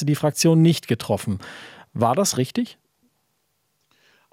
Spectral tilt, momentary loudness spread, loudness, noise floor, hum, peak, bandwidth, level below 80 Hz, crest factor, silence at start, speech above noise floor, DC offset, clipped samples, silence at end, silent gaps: -5.5 dB/octave; 17 LU; -21 LUFS; -71 dBFS; none; -4 dBFS; 16 kHz; -64 dBFS; 18 dB; 0 s; 50 dB; under 0.1%; under 0.1%; 1.6 s; none